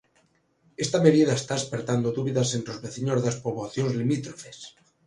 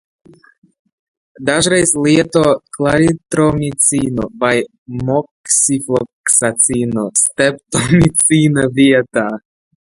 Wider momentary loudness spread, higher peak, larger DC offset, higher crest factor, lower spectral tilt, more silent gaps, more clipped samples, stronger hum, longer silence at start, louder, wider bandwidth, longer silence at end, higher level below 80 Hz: first, 20 LU vs 8 LU; second, -4 dBFS vs 0 dBFS; neither; first, 22 dB vs 14 dB; first, -5.5 dB/octave vs -4 dB/octave; second, none vs 4.78-4.86 s, 5.31-5.44 s, 6.13-6.24 s; neither; neither; second, 0.8 s vs 1.4 s; second, -25 LUFS vs -13 LUFS; about the same, 11.5 kHz vs 12 kHz; about the same, 0.4 s vs 0.45 s; second, -62 dBFS vs -42 dBFS